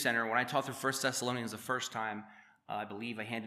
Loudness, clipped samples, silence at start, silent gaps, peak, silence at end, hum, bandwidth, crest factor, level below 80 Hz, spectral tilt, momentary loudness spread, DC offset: -35 LUFS; under 0.1%; 0 s; none; -16 dBFS; 0 s; none; 15 kHz; 20 dB; -86 dBFS; -3 dB/octave; 10 LU; under 0.1%